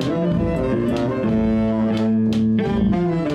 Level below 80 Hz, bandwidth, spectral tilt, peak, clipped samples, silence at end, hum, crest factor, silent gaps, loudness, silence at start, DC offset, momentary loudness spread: -36 dBFS; 8.4 kHz; -8.5 dB/octave; -8 dBFS; under 0.1%; 0 s; none; 10 dB; none; -20 LUFS; 0 s; under 0.1%; 2 LU